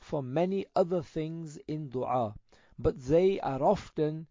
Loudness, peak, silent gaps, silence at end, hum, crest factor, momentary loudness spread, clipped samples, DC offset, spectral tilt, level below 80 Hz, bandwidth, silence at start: -31 LUFS; -14 dBFS; none; 0.05 s; none; 16 dB; 11 LU; under 0.1%; under 0.1%; -8 dB/octave; -52 dBFS; 7.6 kHz; 0.05 s